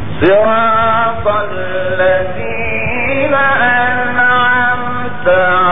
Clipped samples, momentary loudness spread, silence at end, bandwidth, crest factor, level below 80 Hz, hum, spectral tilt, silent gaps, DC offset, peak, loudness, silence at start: under 0.1%; 7 LU; 0 s; 3.9 kHz; 12 dB; -36 dBFS; none; -9 dB/octave; none; 10%; 0 dBFS; -12 LUFS; 0 s